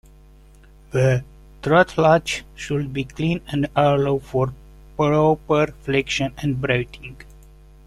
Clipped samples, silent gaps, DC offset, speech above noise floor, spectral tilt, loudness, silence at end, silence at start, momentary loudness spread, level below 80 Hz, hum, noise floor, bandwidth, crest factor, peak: under 0.1%; none; under 0.1%; 27 dB; -6 dB/octave; -21 LUFS; 0.65 s; 0.95 s; 11 LU; -44 dBFS; none; -47 dBFS; 13 kHz; 18 dB; -4 dBFS